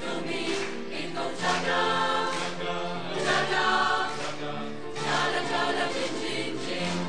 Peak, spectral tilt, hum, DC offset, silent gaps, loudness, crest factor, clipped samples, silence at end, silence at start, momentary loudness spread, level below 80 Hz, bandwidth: -12 dBFS; -3.5 dB/octave; none; 1%; none; -28 LUFS; 16 dB; under 0.1%; 0 s; 0 s; 9 LU; -64 dBFS; 10 kHz